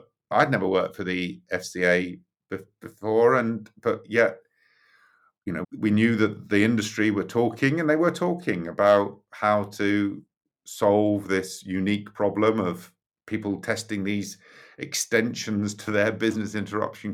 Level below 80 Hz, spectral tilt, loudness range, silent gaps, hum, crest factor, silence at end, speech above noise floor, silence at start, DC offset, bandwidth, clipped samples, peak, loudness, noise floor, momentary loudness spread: -68 dBFS; -5.5 dB/octave; 4 LU; 10.37-10.41 s, 13.06-13.10 s; none; 18 dB; 0 s; 39 dB; 0.3 s; under 0.1%; 15.5 kHz; under 0.1%; -6 dBFS; -25 LUFS; -63 dBFS; 12 LU